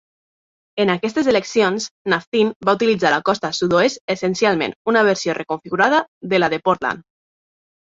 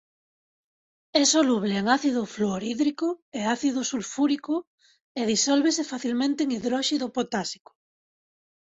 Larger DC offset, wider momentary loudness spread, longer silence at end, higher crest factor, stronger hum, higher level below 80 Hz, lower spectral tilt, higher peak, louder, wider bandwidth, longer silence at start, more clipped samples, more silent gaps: neither; second, 6 LU vs 9 LU; second, 0.9 s vs 1.2 s; about the same, 18 dB vs 18 dB; neither; first, -58 dBFS vs -68 dBFS; first, -4.5 dB/octave vs -3 dB/octave; first, -2 dBFS vs -8 dBFS; first, -18 LUFS vs -25 LUFS; about the same, 7.8 kHz vs 8.4 kHz; second, 0.75 s vs 1.15 s; neither; first, 1.91-2.05 s, 2.27-2.32 s, 2.56-2.60 s, 4.01-4.08 s, 4.76-4.85 s, 6.08-6.21 s vs 3.22-3.32 s, 4.67-4.78 s, 5.04-5.15 s